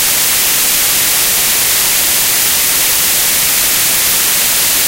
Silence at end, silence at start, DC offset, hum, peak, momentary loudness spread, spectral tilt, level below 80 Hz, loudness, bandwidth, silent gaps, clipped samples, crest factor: 0 s; 0 s; 0.2%; none; 0 dBFS; 0 LU; 1 dB/octave; -40 dBFS; -8 LUFS; over 20 kHz; none; under 0.1%; 12 dB